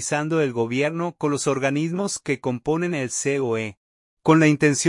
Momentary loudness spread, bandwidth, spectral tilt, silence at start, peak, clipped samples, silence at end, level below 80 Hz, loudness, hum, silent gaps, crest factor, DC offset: 9 LU; 11.5 kHz; -5 dB/octave; 0 s; -4 dBFS; under 0.1%; 0 s; -62 dBFS; -22 LUFS; none; 3.77-4.17 s; 18 dB; under 0.1%